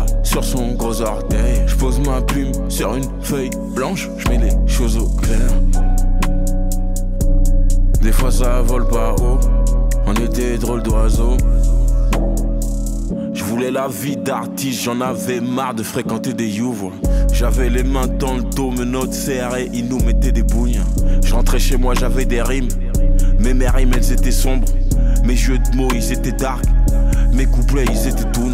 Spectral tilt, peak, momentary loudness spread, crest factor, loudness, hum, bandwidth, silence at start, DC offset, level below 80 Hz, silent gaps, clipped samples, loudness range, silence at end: -5.5 dB/octave; -4 dBFS; 4 LU; 10 dB; -19 LUFS; none; 15.5 kHz; 0 s; under 0.1%; -16 dBFS; none; under 0.1%; 2 LU; 0 s